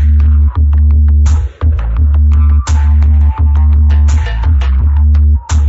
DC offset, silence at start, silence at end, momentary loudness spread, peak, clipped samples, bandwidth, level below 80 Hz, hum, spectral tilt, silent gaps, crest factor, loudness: under 0.1%; 0 s; 0 s; 4 LU; -2 dBFS; under 0.1%; 7.8 kHz; -8 dBFS; none; -7 dB/octave; none; 6 dB; -10 LUFS